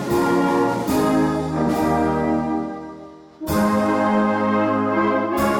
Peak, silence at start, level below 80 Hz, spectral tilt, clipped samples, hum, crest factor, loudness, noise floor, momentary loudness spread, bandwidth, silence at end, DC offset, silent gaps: -10 dBFS; 0 s; -44 dBFS; -6.5 dB/octave; under 0.1%; none; 10 dB; -20 LUFS; -40 dBFS; 8 LU; 17 kHz; 0 s; under 0.1%; none